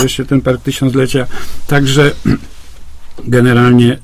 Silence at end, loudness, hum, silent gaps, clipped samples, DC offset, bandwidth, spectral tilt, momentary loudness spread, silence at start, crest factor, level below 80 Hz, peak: 0 s; -11 LUFS; none; none; 0.2%; under 0.1%; 16 kHz; -6 dB/octave; 11 LU; 0 s; 12 dB; -32 dBFS; 0 dBFS